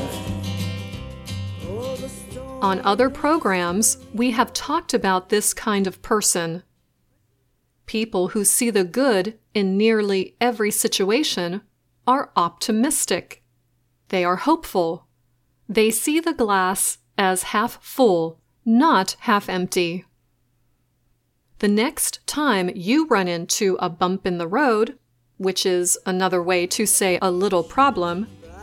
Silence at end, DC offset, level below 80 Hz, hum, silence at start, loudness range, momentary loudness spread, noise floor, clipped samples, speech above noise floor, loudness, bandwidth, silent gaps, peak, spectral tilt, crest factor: 0 s; under 0.1%; -52 dBFS; none; 0 s; 4 LU; 11 LU; -67 dBFS; under 0.1%; 46 dB; -21 LUFS; 17 kHz; none; -2 dBFS; -3.5 dB/octave; 20 dB